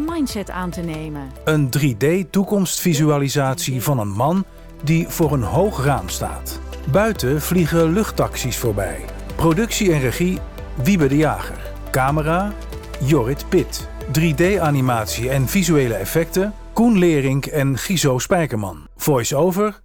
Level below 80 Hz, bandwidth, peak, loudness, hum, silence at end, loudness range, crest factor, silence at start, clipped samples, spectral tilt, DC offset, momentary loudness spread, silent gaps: -34 dBFS; 20 kHz; -4 dBFS; -19 LUFS; none; 0.05 s; 2 LU; 14 dB; 0 s; under 0.1%; -5.5 dB/octave; under 0.1%; 10 LU; none